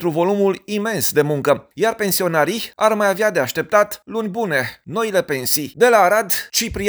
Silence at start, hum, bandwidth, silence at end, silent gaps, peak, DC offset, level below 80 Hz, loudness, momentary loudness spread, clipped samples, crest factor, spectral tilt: 0 s; none; over 20 kHz; 0 s; none; 0 dBFS; under 0.1%; -50 dBFS; -18 LUFS; 7 LU; under 0.1%; 18 dB; -3.5 dB/octave